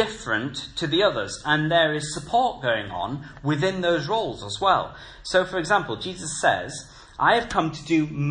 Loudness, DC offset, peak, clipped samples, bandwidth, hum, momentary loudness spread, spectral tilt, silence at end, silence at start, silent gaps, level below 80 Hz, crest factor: -24 LUFS; under 0.1%; -4 dBFS; under 0.1%; 10.5 kHz; none; 10 LU; -4.5 dB/octave; 0 s; 0 s; none; -50 dBFS; 20 dB